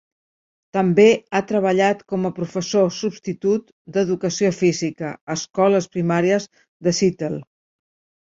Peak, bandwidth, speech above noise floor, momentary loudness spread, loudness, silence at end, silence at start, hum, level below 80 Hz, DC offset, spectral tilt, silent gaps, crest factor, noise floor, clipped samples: -2 dBFS; 7.8 kHz; over 71 dB; 11 LU; -20 LUFS; 0.85 s; 0.75 s; none; -62 dBFS; under 0.1%; -5.5 dB/octave; 3.72-3.85 s, 5.21-5.27 s, 6.68-6.80 s; 18 dB; under -90 dBFS; under 0.1%